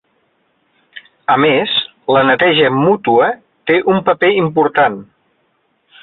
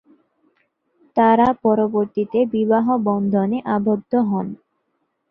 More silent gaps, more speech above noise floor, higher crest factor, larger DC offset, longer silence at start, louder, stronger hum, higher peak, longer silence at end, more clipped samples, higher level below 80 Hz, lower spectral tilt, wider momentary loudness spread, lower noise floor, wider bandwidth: neither; second, 49 dB vs 53 dB; about the same, 14 dB vs 16 dB; neither; second, 0.95 s vs 1.15 s; first, -13 LUFS vs -19 LUFS; neither; about the same, -2 dBFS vs -2 dBFS; first, 1 s vs 0.75 s; neither; about the same, -56 dBFS vs -58 dBFS; about the same, -9 dB/octave vs -10 dB/octave; about the same, 6 LU vs 8 LU; second, -62 dBFS vs -71 dBFS; about the same, 4.3 kHz vs 4.4 kHz